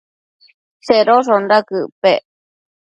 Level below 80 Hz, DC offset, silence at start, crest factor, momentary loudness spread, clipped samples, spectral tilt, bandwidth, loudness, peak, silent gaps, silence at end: -64 dBFS; under 0.1%; 0.85 s; 16 dB; 10 LU; under 0.1%; -5 dB/octave; 8.6 kHz; -14 LUFS; 0 dBFS; 1.92-2.02 s; 0.7 s